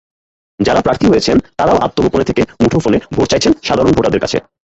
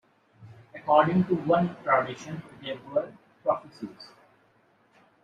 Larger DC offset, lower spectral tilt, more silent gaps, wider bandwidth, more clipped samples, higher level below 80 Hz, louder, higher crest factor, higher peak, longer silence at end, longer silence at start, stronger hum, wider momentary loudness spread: neither; second, -5.5 dB/octave vs -7.5 dB/octave; neither; about the same, 8.2 kHz vs 7.8 kHz; neither; first, -34 dBFS vs -66 dBFS; first, -13 LUFS vs -26 LUFS; second, 14 dB vs 22 dB; first, 0 dBFS vs -8 dBFS; second, 0.3 s vs 1.2 s; first, 0.6 s vs 0.4 s; neither; second, 4 LU vs 20 LU